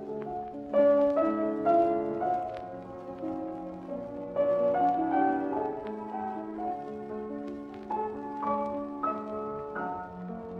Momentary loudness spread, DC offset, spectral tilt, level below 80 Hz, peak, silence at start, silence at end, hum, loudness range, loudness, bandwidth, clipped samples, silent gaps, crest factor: 14 LU; under 0.1%; -8.5 dB/octave; -62 dBFS; -14 dBFS; 0 s; 0 s; none; 7 LU; -31 LUFS; 5.8 kHz; under 0.1%; none; 16 dB